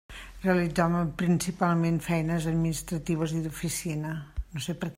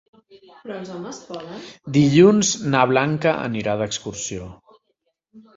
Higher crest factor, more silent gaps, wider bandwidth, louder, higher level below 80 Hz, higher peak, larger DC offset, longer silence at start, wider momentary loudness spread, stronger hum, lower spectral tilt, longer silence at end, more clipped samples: about the same, 18 dB vs 18 dB; neither; first, 16 kHz vs 8 kHz; second, -28 LUFS vs -19 LUFS; first, -46 dBFS vs -54 dBFS; second, -12 dBFS vs -2 dBFS; neither; second, 0.1 s vs 0.65 s; second, 9 LU vs 21 LU; neither; about the same, -6 dB/octave vs -5 dB/octave; about the same, 0.05 s vs 0.15 s; neither